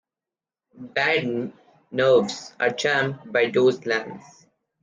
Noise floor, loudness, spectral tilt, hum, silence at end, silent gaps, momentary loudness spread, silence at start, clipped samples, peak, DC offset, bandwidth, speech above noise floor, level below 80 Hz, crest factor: under -90 dBFS; -22 LUFS; -4.5 dB/octave; none; 0.6 s; none; 12 LU; 0.75 s; under 0.1%; -8 dBFS; under 0.1%; 9.6 kHz; over 67 dB; -68 dBFS; 16 dB